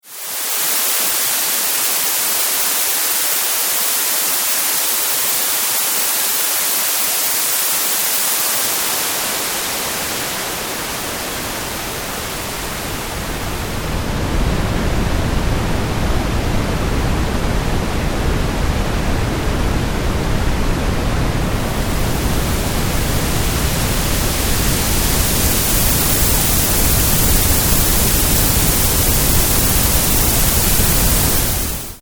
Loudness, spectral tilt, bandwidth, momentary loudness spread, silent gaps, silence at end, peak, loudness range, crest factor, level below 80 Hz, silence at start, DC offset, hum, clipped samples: -16 LUFS; -3 dB/octave; over 20 kHz; 8 LU; none; 0 s; 0 dBFS; 8 LU; 16 dB; -22 dBFS; 0.05 s; under 0.1%; none; under 0.1%